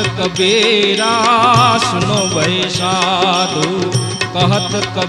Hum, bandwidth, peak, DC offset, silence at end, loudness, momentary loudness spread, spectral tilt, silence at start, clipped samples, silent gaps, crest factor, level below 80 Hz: none; 14.5 kHz; 0 dBFS; under 0.1%; 0 s; -13 LUFS; 7 LU; -4 dB/octave; 0 s; under 0.1%; none; 14 dB; -46 dBFS